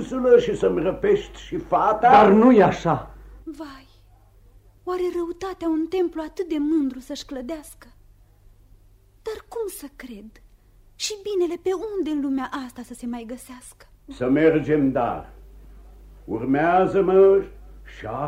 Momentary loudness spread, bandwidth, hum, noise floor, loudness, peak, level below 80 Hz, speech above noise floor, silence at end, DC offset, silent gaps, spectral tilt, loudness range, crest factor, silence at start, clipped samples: 22 LU; 15.5 kHz; none; -53 dBFS; -21 LUFS; -4 dBFS; -48 dBFS; 32 dB; 0 s; under 0.1%; none; -6 dB/octave; 15 LU; 18 dB; 0 s; under 0.1%